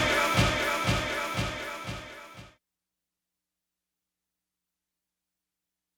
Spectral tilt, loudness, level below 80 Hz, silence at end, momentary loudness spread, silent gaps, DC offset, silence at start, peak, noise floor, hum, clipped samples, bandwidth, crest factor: -4 dB/octave; -28 LUFS; -46 dBFS; 3.5 s; 19 LU; none; under 0.1%; 0 s; -10 dBFS; -88 dBFS; none; under 0.1%; over 20 kHz; 22 dB